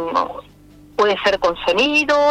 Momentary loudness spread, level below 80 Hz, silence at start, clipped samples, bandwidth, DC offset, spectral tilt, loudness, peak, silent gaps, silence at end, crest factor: 13 LU; -48 dBFS; 0 s; under 0.1%; 13.5 kHz; under 0.1%; -3 dB/octave; -17 LUFS; -6 dBFS; none; 0 s; 12 dB